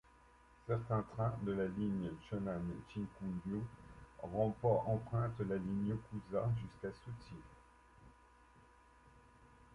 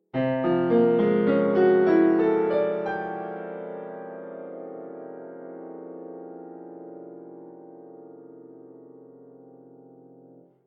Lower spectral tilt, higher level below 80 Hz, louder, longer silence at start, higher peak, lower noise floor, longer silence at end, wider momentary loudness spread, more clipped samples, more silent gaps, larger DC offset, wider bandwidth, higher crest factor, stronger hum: about the same, -9.5 dB/octave vs -10 dB/octave; about the same, -62 dBFS vs -66 dBFS; second, -40 LUFS vs -23 LUFS; first, 0.65 s vs 0.15 s; second, -22 dBFS vs -10 dBFS; first, -65 dBFS vs -53 dBFS; second, 0 s vs 1.1 s; second, 16 LU vs 26 LU; neither; neither; neither; first, 11 kHz vs 5.8 kHz; about the same, 20 dB vs 18 dB; neither